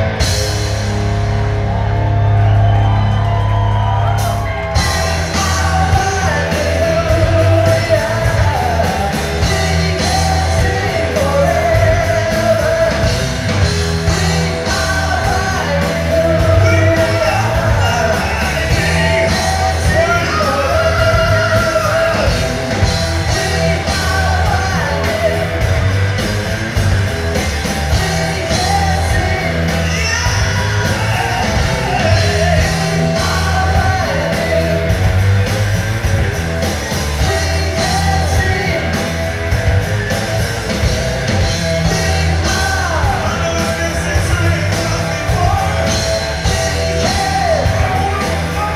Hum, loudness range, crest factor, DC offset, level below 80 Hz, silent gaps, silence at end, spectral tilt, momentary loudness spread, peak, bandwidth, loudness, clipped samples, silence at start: none; 2 LU; 14 dB; under 0.1%; -22 dBFS; none; 0 s; -5 dB/octave; 4 LU; 0 dBFS; 15 kHz; -14 LUFS; under 0.1%; 0 s